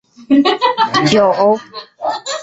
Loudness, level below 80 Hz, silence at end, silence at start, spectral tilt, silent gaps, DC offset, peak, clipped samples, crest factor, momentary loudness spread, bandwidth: -14 LUFS; -54 dBFS; 0 s; 0.2 s; -4.5 dB/octave; none; under 0.1%; -2 dBFS; under 0.1%; 12 dB; 11 LU; 8.2 kHz